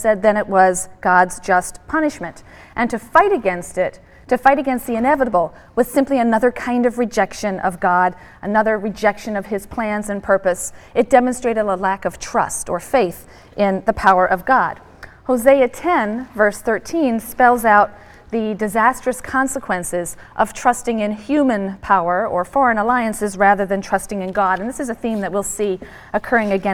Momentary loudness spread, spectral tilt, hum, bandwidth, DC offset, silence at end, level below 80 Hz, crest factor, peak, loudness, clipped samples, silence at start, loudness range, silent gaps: 9 LU; -5 dB/octave; none; 18 kHz; under 0.1%; 0 s; -44 dBFS; 18 dB; 0 dBFS; -18 LUFS; under 0.1%; 0 s; 3 LU; none